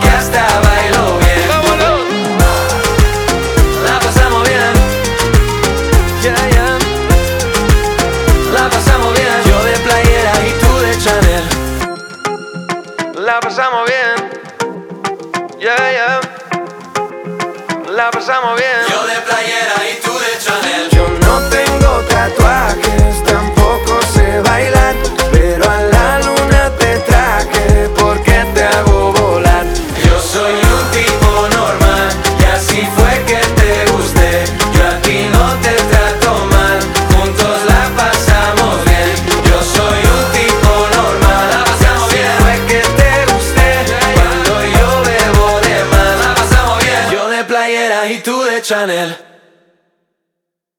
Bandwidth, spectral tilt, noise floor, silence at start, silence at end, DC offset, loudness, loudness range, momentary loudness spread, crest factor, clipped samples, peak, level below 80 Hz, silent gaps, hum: 20 kHz; -4.5 dB/octave; -76 dBFS; 0 s; 1.6 s; under 0.1%; -11 LUFS; 5 LU; 6 LU; 10 dB; 0.4%; 0 dBFS; -16 dBFS; none; none